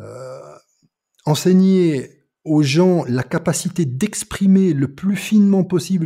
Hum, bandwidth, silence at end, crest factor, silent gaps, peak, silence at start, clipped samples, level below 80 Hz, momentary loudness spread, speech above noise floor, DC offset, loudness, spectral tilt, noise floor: none; 15.5 kHz; 0 s; 14 dB; none; -4 dBFS; 0 s; under 0.1%; -52 dBFS; 19 LU; 48 dB; under 0.1%; -17 LUFS; -6.5 dB/octave; -64 dBFS